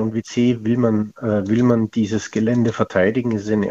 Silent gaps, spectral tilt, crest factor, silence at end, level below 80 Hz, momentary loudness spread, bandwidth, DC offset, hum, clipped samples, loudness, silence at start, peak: none; -7 dB/octave; 16 dB; 0 s; -54 dBFS; 5 LU; 7.8 kHz; under 0.1%; none; under 0.1%; -19 LUFS; 0 s; -2 dBFS